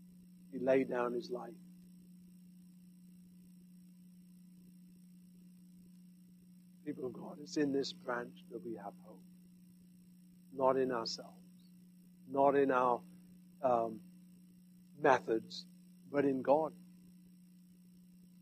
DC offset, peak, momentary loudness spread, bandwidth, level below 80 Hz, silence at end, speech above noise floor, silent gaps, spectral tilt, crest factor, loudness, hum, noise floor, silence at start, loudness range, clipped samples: under 0.1%; -14 dBFS; 27 LU; 14.5 kHz; -82 dBFS; 1.55 s; 26 dB; none; -5.5 dB/octave; 26 dB; -36 LUFS; none; -61 dBFS; 0 s; 13 LU; under 0.1%